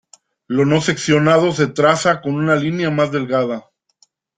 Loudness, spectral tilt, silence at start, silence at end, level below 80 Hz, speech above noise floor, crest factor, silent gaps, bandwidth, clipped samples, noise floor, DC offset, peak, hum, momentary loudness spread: -16 LUFS; -5.5 dB/octave; 0.5 s; 0.8 s; -56 dBFS; 43 dB; 16 dB; none; 9.4 kHz; under 0.1%; -59 dBFS; under 0.1%; -2 dBFS; none; 6 LU